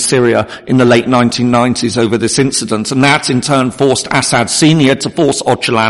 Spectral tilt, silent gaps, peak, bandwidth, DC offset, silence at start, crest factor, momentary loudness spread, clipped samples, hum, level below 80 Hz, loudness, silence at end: -4.5 dB/octave; none; 0 dBFS; 11.5 kHz; under 0.1%; 0 s; 10 dB; 4 LU; under 0.1%; none; -44 dBFS; -11 LUFS; 0 s